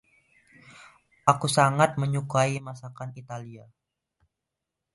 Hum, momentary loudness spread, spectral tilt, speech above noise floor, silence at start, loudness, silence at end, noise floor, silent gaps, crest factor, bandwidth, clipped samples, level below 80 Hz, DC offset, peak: none; 18 LU; -5 dB/octave; 60 dB; 0.8 s; -24 LUFS; 1.35 s; -85 dBFS; none; 26 dB; 11.5 kHz; under 0.1%; -66 dBFS; under 0.1%; -4 dBFS